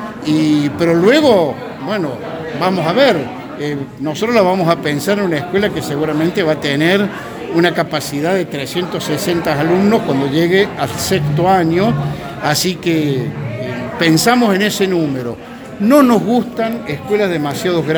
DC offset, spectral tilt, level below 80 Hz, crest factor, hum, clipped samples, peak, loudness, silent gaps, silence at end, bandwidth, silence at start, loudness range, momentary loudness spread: under 0.1%; -5.5 dB/octave; -46 dBFS; 14 dB; none; under 0.1%; 0 dBFS; -15 LUFS; none; 0 s; over 20 kHz; 0 s; 2 LU; 11 LU